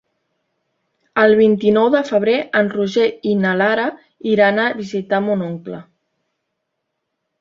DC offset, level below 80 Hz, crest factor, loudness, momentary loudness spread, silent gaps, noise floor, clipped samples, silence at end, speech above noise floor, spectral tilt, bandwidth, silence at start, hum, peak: under 0.1%; -62 dBFS; 16 dB; -16 LUFS; 12 LU; none; -75 dBFS; under 0.1%; 1.6 s; 60 dB; -6.5 dB/octave; 7.4 kHz; 1.15 s; none; -2 dBFS